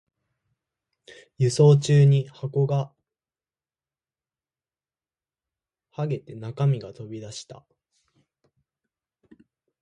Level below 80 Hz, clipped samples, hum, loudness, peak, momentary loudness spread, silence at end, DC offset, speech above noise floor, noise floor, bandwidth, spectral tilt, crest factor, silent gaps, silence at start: -66 dBFS; under 0.1%; none; -22 LUFS; -6 dBFS; 21 LU; 2.3 s; under 0.1%; over 68 dB; under -90 dBFS; 9.8 kHz; -7.5 dB/octave; 20 dB; none; 1.4 s